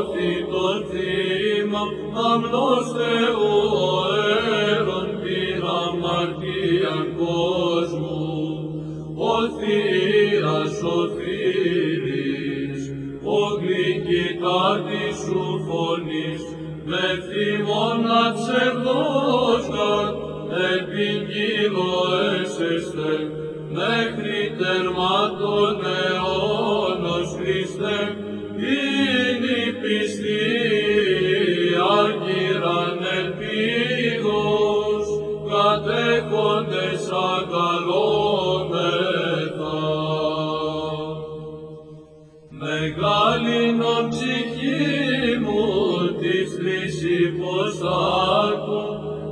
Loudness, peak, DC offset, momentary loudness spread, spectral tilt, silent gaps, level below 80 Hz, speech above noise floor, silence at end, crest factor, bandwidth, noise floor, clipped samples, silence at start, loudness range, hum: -22 LUFS; -6 dBFS; under 0.1%; 7 LU; -5.5 dB/octave; none; -52 dBFS; 25 dB; 0 s; 16 dB; 10.5 kHz; -46 dBFS; under 0.1%; 0 s; 3 LU; none